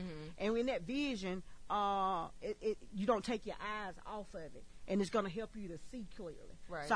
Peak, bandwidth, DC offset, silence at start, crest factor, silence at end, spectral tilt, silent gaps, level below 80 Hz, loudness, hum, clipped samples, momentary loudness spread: -20 dBFS; 10.5 kHz; under 0.1%; 0 s; 20 dB; 0 s; -5.5 dB/octave; none; -58 dBFS; -40 LUFS; none; under 0.1%; 15 LU